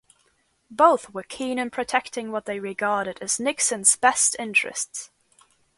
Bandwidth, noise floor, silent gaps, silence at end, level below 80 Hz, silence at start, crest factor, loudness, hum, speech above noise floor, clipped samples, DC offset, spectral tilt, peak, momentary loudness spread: 12 kHz; -67 dBFS; none; 0.7 s; -66 dBFS; 0.7 s; 22 dB; -22 LUFS; none; 43 dB; under 0.1%; under 0.1%; -1 dB/octave; -2 dBFS; 13 LU